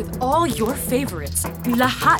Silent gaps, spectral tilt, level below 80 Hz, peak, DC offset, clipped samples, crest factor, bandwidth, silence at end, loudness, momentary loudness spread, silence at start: none; -4 dB/octave; -40 dBFS; -2 dBFS; under 0.1%; under 0.1%; 18 dB; 19.5 kHz; 0 s; -21 LUFS; 5 LU; 0 s